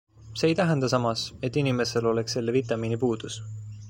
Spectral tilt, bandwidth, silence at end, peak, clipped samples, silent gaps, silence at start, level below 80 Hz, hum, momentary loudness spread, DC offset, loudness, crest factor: -5.5 dB/octave; 16.5 kHz; 0 s; -8 dBFS; under 0.1%; none; 0.2 s; -56 dBFS; none; 11 LU; under 0.1%; -26 LUFS; 18 dB